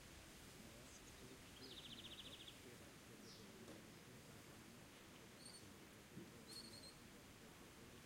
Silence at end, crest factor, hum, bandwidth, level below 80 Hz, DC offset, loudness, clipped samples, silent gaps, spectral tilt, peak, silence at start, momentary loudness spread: 0 s; 16 dB; none; 16.5 kHz; -74 dBFS; under 0.1%; -59 LUFS; under 0.1%; none; -3 dB/octave; -44 dBFS; 0 s; 6 LU